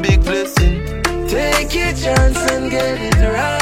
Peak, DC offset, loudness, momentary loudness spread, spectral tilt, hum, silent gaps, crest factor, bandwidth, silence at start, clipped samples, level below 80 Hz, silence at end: 0 dBFS; under 0.1%; -16 LUFS; 4 LU; -5 dB/octave; none; none; 14 dB; 16.5 kHz; 0 s; under 0.1%; -18 dBFS; 0 s